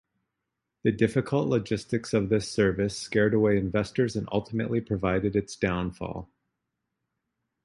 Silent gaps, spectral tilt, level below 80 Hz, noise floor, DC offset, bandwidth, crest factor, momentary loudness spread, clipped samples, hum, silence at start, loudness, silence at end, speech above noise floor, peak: none; -6.5 dB/octave; -50 dBFS; -84 dBFS; under 0.1%; 11.5 kHz; 18 dB; 6 LU; under 0.1%; none; 0.85 s; -27 LUFS; 1.4 s; 58 dB; -8 dBFS